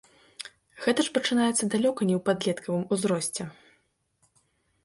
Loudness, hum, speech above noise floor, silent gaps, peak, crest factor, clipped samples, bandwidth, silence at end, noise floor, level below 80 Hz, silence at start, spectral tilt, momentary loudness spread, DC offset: -26 LUFS; none; 44 dB; none; -10 dBFS; 18 dB; under 0.1%; 11.5 kHz; 1.3 s; -70 dBFS; -68 dBFS; 0.4 s; -4 dB/octave; 17 LU; under 0.1%